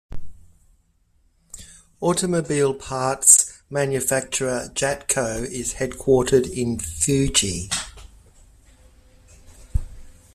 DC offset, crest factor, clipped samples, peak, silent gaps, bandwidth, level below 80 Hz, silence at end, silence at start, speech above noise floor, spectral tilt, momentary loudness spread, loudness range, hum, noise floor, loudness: under 0.1%; 24 dB; under 0.1%; 0 dBFS; none; 15.5 kHz; -40 dBFS; 0.2 s; 0.1 s; 41 dB; -3 dB/octave; 16 LU; 6 LU; none; -62 dBFS; -20 LUFS